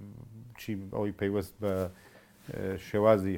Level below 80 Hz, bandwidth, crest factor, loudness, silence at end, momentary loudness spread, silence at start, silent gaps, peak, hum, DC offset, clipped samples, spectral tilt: -60 dBFS; 17 kHz; 22 dB; -32 LUFS; 0 s; 22 LU; 0 s; none; -10 dBFS; none; under 0.1%; under 0.1%; -7.5 dB/octave